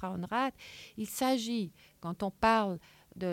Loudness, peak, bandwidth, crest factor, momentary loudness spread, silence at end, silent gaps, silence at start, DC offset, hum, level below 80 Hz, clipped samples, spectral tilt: -33 LUFS; -14 dBFS; 17 kHz; 18 dB; 16 LU; 0 s; none; 0 s; under 0.1%; none; -62 dBFS; under 0.1%; -4.5 dB/octave